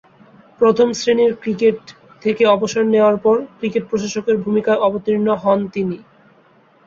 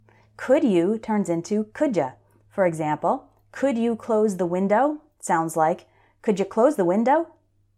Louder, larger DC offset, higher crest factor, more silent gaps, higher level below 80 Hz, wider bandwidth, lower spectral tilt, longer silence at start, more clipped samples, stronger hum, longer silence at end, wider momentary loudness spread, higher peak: first, -17 LUFS vs -23 LUFS; neither; about the same, 16 dB vs 16 dB; neither; first, -58 dBFS vs -66 dBFS; second, 7.6 kHz vs 14 kHz; about the same, -5.5 dB/octave vs -6.5 dB/octave; first, 0.6 s vs 0.4 s; neither; neither; first, 0.85 s vs 0.5 s; about the same, 8 LU vs 10 LU; first, -2 dBFS vs -6 dBFS